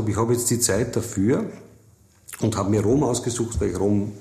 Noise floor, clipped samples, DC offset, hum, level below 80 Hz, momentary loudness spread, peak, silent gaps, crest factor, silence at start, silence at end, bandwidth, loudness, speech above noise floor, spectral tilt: -55 dBFS; under 0.1%; under 0.1%; none; -42 dBFS; 6 LU; -6 dBFS; none; 16 dB; 0 s; 0 s; 15 kHz; -22 LUFS; 33 dB; -5.5 dB/octave